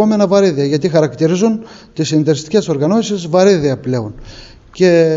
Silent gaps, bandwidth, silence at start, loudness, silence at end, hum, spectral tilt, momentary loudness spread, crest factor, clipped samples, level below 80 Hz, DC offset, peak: none; 8 kHz; 0 s; -14 LUFS; 0 s; none; -6 dB/octave; 10 LU; 12 dB; under 0.1%; -46 dBFS; under 0.1%; 0 dBFS